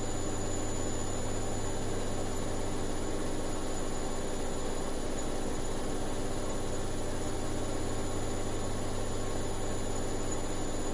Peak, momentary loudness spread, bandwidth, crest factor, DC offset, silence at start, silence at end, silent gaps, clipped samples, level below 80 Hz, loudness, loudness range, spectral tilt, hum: -20 dBFS; 1 LU; 11.5 kHz; 12 dB; under 0.1%; 0 s; 0 s; none; under 0.1%; -36 dBFS; -36 LUFS; 1 LU; -4.5 dB/octave; none